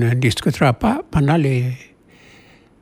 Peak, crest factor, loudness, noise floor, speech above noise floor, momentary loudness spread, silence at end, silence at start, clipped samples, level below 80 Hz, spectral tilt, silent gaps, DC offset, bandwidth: -4 dBFS; 16 dB; -18 LUFS; -48 dBFS; 31 dB; 7 LU; 0.95 s; 0 s; under 0.1%; -40 dBFS; -6.5 dB/octave; none; under 0.1%; 14.5 kHz